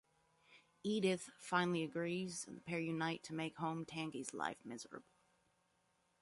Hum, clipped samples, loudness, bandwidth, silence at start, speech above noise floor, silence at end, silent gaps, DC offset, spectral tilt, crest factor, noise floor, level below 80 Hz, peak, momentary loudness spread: none; under 0.1%; -42 LUFS; 11.5 kHz; 0.5 s; 38 dB; 1.2 s; none; under 0.1%; -4.5 dB/octave; 22 dB; -80 dBFS; -82 dBFS; -22 dBFS; 12 LU